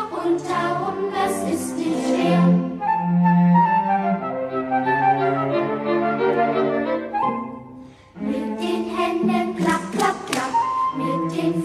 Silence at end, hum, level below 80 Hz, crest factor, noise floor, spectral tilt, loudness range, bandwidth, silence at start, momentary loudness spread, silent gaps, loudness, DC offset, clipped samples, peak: 0 s; none; -58 dBFS; 16 dB; -42 dBFS; -6.5 dB/octave; 5 LU; 13 kHz; 0 s; 8 LU; none; -21 LUFS; under 0.1%; under 0.1%; -6 dBFS